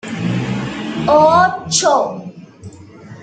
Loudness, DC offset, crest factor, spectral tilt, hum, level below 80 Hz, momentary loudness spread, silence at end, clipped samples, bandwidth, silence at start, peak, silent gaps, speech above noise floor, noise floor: -15 LUFS; under 0.1%; 16 dB; -4 dB/octave; none; -50 dBFS; 13 LU; 0 s; under 0.1%; 9.4 kHz; 0.05 s; -2 dBFS; none; 25 dB; -37 dBFS